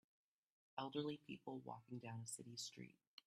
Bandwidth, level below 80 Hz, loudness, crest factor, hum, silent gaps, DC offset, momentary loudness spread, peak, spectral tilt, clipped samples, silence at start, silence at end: 13.5 kHz; -90 dBFS; -52 LUFS; 20 dB; none; none; under 0.1%; 8 LU; -32 dBFS; -4.5 dB/octave; under 0.1%; 0.75 s; 0.35 s